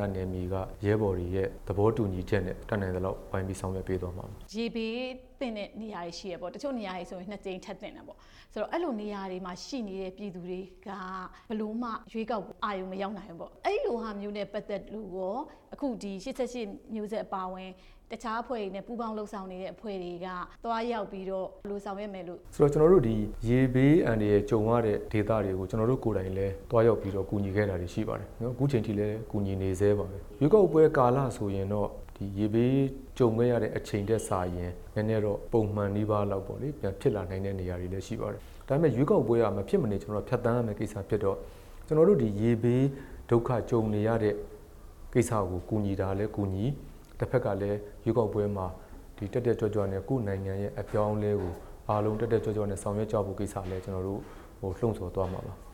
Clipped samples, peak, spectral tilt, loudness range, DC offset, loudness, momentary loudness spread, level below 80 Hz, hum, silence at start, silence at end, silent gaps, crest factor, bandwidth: under 0.1%; -8 dBFS; -7.5 dB/octave; 10 LU; under 0.1%; -30 LUFS; 14 LU; -48 dBFS; none; 0 s; 0 s; none; 22 dB; 17 kHz